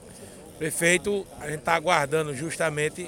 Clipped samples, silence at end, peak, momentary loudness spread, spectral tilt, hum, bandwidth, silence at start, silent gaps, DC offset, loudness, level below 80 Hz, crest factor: under 0.1%; 0 s; -4 dBFS; 16 LU; -3.5 dB/octave; none; 17 kHz; 0 s; none; under 0.1%; -25 LUFS; -56 dBFS; 22 dB